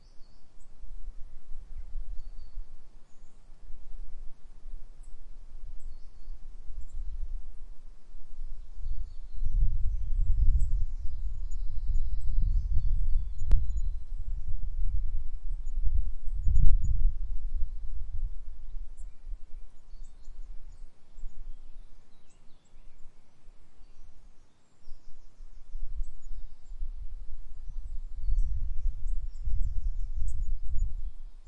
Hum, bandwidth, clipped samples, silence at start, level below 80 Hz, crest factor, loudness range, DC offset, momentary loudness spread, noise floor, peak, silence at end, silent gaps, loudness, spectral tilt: none; 0.6 kHz; under 0.1%; 0.15 s; -30 dBFS; 20 dB; 18 LU; under 0.1%; 22 LU; -48 dBFS; -4 dBFS; 0 s; none; -37 LUFS; -7.5 dB/octave